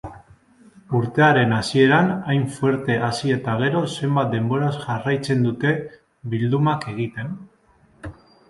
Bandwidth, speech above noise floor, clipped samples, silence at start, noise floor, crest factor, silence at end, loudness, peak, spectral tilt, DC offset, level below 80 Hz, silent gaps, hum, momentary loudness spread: 11.5 kHz; 36 dB; under 0.1%; 0.05 s; -56 dBFS; 18 dB; 0.35 s; -21 LUFS; -2 dBFS; -6.5 dB/octave; under 0.1%; -54 dBFS; none; none; 20 LU